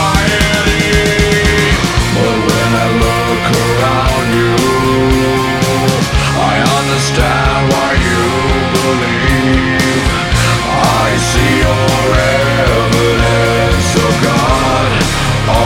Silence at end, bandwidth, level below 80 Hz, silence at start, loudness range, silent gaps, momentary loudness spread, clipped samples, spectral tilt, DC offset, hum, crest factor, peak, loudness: 0 s; 17 kHz; -20 dBFS; 0 s; 1 LU; none; 2 LU; under 0.1%; -4.5 dB/octave; under 0.1%; none; 10 dB; 0 dBFS; -11 LUFS